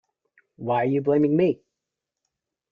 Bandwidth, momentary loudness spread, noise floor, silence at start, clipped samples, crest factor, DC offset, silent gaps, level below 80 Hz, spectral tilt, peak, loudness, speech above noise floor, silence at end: 4.9 kHz; 13 LU; -85 dBFS; 0.6 s; under 0.1%; 16 dB; under 0.1%; none; -66 dBFS; -10 dB/octave; -10 dBFS; -22 LUFS; 64 dB; 1.2 s